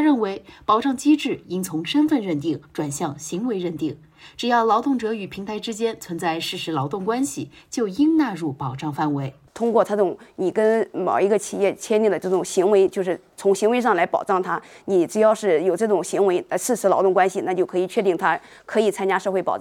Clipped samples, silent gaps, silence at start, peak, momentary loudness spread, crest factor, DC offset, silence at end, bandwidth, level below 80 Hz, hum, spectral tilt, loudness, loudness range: under 0.1%; none; 0 s; -4 dBFS; 9 LU; 18 dB; under 0.1%; 0 s; 16.5 kHz; -64 dBFS; none; -5 dB/octave; -22 LUFS; 4 LU